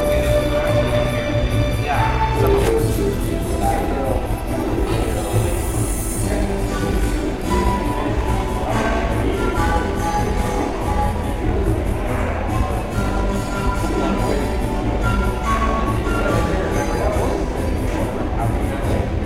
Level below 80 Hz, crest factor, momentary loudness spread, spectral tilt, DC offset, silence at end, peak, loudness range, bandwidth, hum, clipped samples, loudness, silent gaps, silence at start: -24 dBFS; 16 dB; 4 LU; -6 dB/octave; 0.5%; 0 s; -2 dBFS; 2 LU; 16.5 kHz; none; under 0.1%; -20 LUFS; none; 0 s